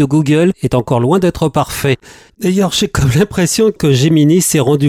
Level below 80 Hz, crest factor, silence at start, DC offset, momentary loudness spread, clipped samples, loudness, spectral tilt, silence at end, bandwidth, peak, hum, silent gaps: -36 dBFS; 10 dB; 0 s; under 0.1%; 6 LU; under 0.1%; -12 LUFS; -5.5 dB/octave; 0 s; 16.5 kHz; -2 dBFS; none; none